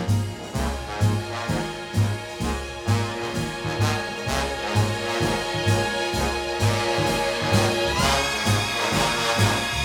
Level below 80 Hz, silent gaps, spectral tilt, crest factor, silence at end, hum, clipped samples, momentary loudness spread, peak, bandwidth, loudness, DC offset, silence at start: -38 dBFS; none; -4.5 dB/octave; 18 dB; 0 s; none; under 0.1%; 7 LU; -6 dBFS; 17.5 kHz; -23 LUFS; under 0.1%; 0 s